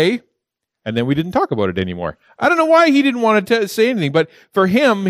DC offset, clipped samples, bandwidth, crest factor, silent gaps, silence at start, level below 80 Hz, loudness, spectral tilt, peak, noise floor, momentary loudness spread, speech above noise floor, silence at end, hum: under 0.1%; under 0.1%; 15.5 kHz; 14 dB; none; 0 s; -54 dBFS; -16 LUFS; -6 dB/octave; -2 dBFS; -79 dBFS; 12 LU; 63 dB; 0 s; none